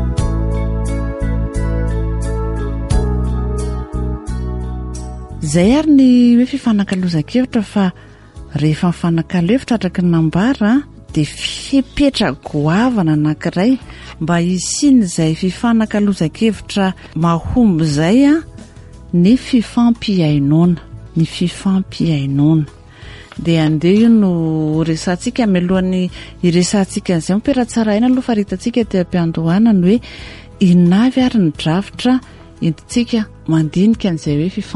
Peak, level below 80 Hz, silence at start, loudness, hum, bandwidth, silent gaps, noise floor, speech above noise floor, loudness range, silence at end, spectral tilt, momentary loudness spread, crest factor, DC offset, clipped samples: -2 dBFS; -28 dBFS; 0 s; -15 LUFS; none; 11.5 kHz; none; -36 dBFS; 22 dB; 3 LU; 0 s; -6.5 dB/octave; 10 LU; 14 dB; under 0.1%; under 0.1%